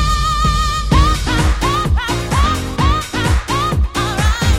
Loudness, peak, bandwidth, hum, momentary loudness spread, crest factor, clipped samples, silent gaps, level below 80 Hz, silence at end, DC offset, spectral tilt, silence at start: -16 LUFS; 0 dBFS; 16 kHz; none; 3 LU; 14 dB; under 0.1%; none; -18 dBFS; 0 s; under 0.1%; -4.5 dB/octave; 0 s